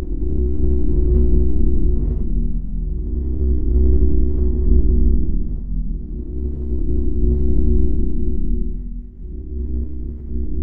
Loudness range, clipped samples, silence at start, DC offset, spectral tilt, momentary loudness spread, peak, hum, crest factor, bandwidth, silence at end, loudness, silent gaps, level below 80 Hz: 3 LU; under 0.1%; 0 s; under 0.1%; -14.5 dB/octave; 11 LU; 0 dBFS; none; 14 dB; 1.1 kHz; 0 s; -22 LUFS; none; -18 dBFS